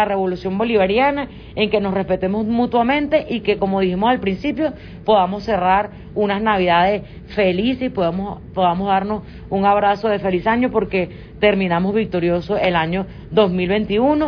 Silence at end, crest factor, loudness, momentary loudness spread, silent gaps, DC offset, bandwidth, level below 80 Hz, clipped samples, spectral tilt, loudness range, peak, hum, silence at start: 0 s; 16 dB; -18 LUFS; 7 LU; none; under 0.1%; 5.4 kHz; -42 dBFS; under 0.1%; -8.5 dB/octave; 1 LU; -2 dBFS; none; 0 s